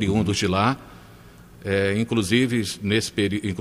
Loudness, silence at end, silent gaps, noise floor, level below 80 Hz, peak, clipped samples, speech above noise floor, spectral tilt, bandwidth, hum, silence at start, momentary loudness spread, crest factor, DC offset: -23 LUFS; 0 s; none; -46 dBFS; -50 dBFS; -4 dBFS; under 0.1%; 24 dB; -5 dB/octave; 15.5 kHz; none; 0 s; 5 LU; 18 dB; under 0.1%